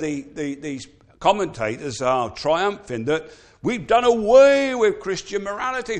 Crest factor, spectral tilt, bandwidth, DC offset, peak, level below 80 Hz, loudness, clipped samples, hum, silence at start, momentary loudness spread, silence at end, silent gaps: 18 dB; -4.5 dB/octave; 9.6 kHz; under 0.1%; -2 dBFS; -52 dBFS; -20 LUFS; under 0.1%; none; 0 s; 15 LU; 0 s; none